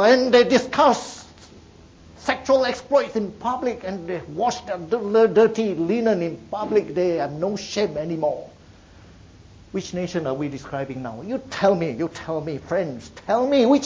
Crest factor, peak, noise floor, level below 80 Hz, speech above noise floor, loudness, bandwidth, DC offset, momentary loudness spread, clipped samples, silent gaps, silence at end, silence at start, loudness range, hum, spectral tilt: 18 dB; -4 dBFS; -48 dBFS; -54 dBFS; 26 dB; -22 LUFS; 8 kHz; under 0.1%; 13 LU; under 0.1%; none; 0 s; 0 s; 7 LU; none; -5.5 dB/octave